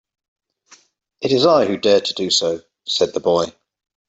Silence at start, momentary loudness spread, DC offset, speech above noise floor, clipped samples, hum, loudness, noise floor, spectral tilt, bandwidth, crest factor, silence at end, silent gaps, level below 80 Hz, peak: 1.2 s; 11 LU; under 0.1%; 35 dB; under 0.1%; none; -18 LUFS; -52 dBFS; -3.5 dB/octave; 8.2 kHz; 16 dB; 0.6 s; none; -62 dBFS; -2 dBFS